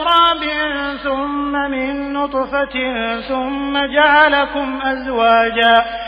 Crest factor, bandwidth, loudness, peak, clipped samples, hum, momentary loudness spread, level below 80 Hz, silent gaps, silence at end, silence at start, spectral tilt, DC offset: 16 dB; 5.4 kHz; -16 LUFS; 0 dBFS; under 0.1%; none; 9 LU; -42 dBFS; none; 0 s; 0 s; -5 dB/octave; under 0.1%